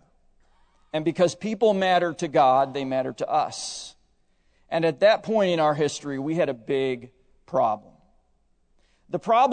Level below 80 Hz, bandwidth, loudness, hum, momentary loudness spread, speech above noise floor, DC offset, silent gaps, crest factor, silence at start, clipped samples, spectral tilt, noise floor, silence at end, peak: -64 dBFS; 9.4 kHz; -24 LUFS; none; 12 LU; 42 dB; under 0.1%; none; 18 dB; 0.95 s; under 0.1%; -5 dB/octave; -65 dBFS; 0 s; -6 dBFS